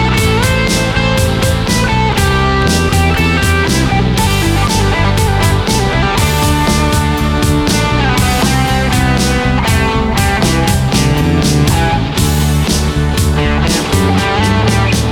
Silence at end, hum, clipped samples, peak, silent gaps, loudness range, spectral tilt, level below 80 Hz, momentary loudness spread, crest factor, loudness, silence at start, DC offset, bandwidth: 0 s; none; under 0.1%; 0 dBFS; none; 1 LU; -5 dB/octave; -18 dBFS; 2 LU; 10 dB; -12 LUFS; 0 s; under 0.1%; 19 kHz